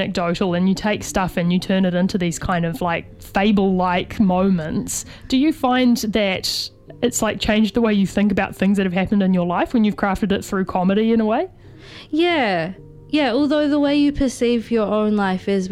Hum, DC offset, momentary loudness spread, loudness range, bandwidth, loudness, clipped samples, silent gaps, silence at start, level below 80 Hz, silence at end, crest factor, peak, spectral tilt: none; under 0.1%; 6 LU; 2 LU; 15 kHz; -19 LUFS; under 0.1%; none; 0 s; -42 dBFS; 0 s; 16 dB; -4 dBFS; -5.5 dB/octave